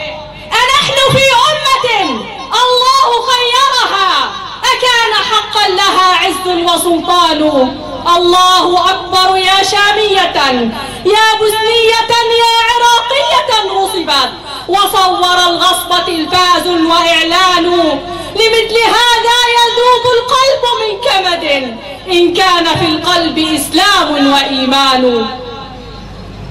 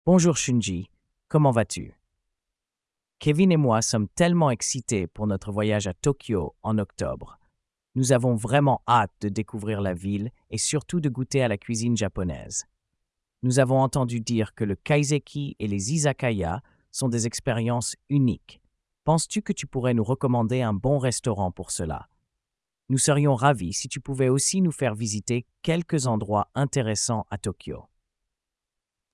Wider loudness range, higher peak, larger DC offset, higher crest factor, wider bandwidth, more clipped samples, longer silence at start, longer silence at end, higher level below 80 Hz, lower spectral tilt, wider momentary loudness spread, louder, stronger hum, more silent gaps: about the same, 2 LU vs 3 LU; first, 0 dBFS vs -6 dBFS; neither; second, 10 dB vs 20 dB; first, 16 kHz vs 12 kHz; neither; about the same, 0 s vs 0.05 s; second, 0 s vs 1.3 s; first, -40 dBFS vs -52 dBFS; second, -2.5 dB/octave vs -5.5 dB/octave; second, 7 LU vs 11 LU; first, -9 LUFS vs -25 LUFS; neither; neither